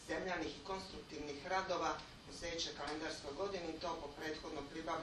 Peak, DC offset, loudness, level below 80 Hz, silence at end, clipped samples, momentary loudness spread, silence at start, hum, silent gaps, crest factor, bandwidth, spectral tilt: -24 dBFS; under 0.1%; -43 LUFS; -62 dBFS; 0 s; under 0.1%; 8 LU; 0 s; none; none; 20 dB; 12 kHz; -3.5 dB/octave